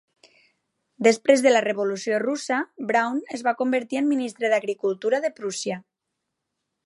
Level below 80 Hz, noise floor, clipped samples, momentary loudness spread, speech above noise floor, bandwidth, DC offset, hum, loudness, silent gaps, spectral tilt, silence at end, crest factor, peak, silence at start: -78 dBFS; -81 dBFS; under 0.1%; 10 LU; 59 dB; 11.5 kHz; under 0.1%; none; -23 LUFS; none; -3.5 dB/octave; 1.05 s; 22 dB; -2 dBFS; 1 s